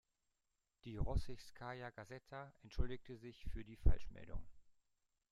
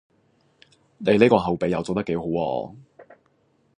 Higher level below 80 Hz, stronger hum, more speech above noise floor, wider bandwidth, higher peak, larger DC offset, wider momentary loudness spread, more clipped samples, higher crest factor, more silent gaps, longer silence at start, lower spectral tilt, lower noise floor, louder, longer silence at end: first, -46 dBFS vs -54 dBFS; neither; first, 48 dB vs 43 dB; about the same, 9.8 kHz vs 10 kHz; second, -18 dBFS vs 0 dBFS; neither; first, 14 LU vs 11 LU; neither; about the same, 24 dB vs 24 dB; neither; second, 0.85 s vs 1 s; about the same, -7 dB/octave vs -7 dB/octave; first, -88 dBFS vs -65 dBFS; second, -48 LUFS vs -22 LUFS; about the same, 0.7 s vs 0.75 s